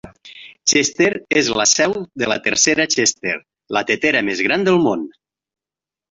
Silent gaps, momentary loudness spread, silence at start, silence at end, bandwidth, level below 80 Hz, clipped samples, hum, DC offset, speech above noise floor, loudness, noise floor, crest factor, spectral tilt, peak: none; 9 LU; 0.05 s; 1.05 s; 8.2 kHz; -56 dBFS; under 0.1%; none; under 0.1%; 72 dB; -16 LUFS; -89 dBFS; 16 dB; -2 dB/octave; -2 dBFS